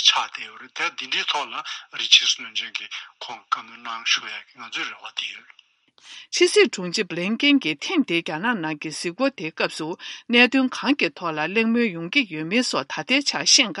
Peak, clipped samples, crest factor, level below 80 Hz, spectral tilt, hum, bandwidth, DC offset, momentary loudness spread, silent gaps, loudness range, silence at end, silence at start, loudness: 0 dBFS; under 0.1%; 24 dB; -80 dBFS; -2 dB/octave; none; 11.5 kHz; under 0.1%; 16 LU; none; 6 LU; 0 s; 0 s; -21 LUFS